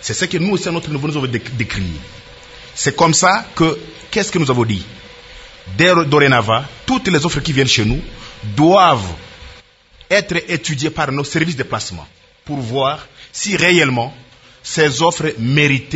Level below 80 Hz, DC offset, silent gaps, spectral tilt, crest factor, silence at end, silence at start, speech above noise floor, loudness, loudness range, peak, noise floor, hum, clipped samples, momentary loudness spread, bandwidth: -38 dBFS; under 0.1%; none; -4 dB/octave; 16 dB; 0 s; 0 s; 31 dB; -15 LUFS; 5 LU; 0 dBFS; -46 dBFS; none; under 0.1%; 19 LU; 8.2 kHz